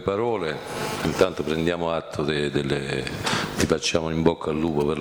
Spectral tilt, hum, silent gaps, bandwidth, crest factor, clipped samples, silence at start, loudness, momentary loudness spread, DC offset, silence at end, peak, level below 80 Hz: -5 dB/octave; none; none; over 20 kHz; 18 dB; under 0.1%; 0 s; -24 LUFS; 5 LU; under 0.1%; 0 s; -6 dBFS; -46 dBFS